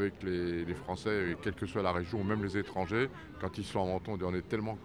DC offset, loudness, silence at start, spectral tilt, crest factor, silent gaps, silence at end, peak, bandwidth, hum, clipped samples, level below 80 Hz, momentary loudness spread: under 0.1%; -35 LUFS; 0 s; -7 dB/octave; 20 dB; none; 0 s; -16 dBFS; 12 kHz; none; under 0.1%; -56 dBFS; 4 LU